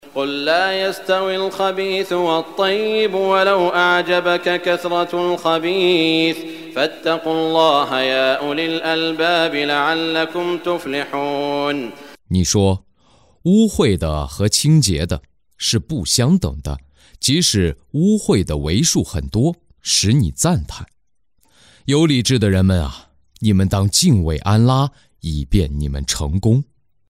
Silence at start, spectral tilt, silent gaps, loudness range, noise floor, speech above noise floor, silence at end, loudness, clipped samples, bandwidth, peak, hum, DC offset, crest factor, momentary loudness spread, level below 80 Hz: 0.05 s; -4.5 dB/octave; none; 3 LU; -69 dBFS; 52 dB; 0.45 s; -17 LUFS; under 0.1%; 16 kHz; -2 dBFS; none; under 0.1%; 16 dB; 8 LU; -34 dBFS